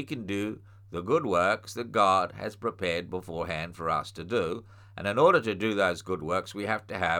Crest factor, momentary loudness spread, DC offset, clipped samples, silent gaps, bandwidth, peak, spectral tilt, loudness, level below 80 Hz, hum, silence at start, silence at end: 20 dB; 12 LU; under 0.1%; under 0.1%; none; 17.5 kHz; -10 dBFS; -5 dB/octave; -28 LUFS; -58 dBFS; none; 0 s; 0 s